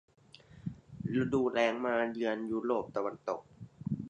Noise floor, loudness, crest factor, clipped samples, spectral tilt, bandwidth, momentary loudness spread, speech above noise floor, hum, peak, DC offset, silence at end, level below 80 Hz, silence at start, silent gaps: -54 dBFS; -33 LUFS; 18 dB; under 0.1%; -7 dB/octave; 9.2 kHz; 15 LU; 21 dB; none; -16 dBFS; under 0.1%; 0 s; -64 dBFS; 0.5 s; none